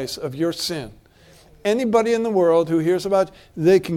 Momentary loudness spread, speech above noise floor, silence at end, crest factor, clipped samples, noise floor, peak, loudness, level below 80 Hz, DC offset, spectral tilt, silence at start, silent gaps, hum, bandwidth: 10 LU; 31 dB; 0 s; 16 dB; under 0.1%; -50 dBFS; -4 dBFS; -20 LUFS; -54 dBFS; under 0.1%; -5.5 dB/octave; 0 s; none; none; 16.5 kHz